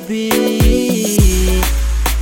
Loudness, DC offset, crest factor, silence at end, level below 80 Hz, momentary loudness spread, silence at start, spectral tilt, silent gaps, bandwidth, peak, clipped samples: -14 LUFS; under 0.1%; 12 dB; 0 s; -16 dBFS; 4 LU; 0 s; -5 dB/octave; none; 17 kHz; 0 dBFS; under 0.1%